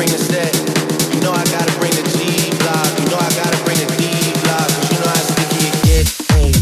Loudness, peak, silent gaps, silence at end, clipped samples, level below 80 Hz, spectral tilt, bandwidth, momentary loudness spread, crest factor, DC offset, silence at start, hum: -15 LUFS; -2 dBFS; none; 0 s; under 0.1%; -24 dBFS; -4 dB/octave; 16 kHz; 3 LU; 12 dB; under 0.1%; 0 s; none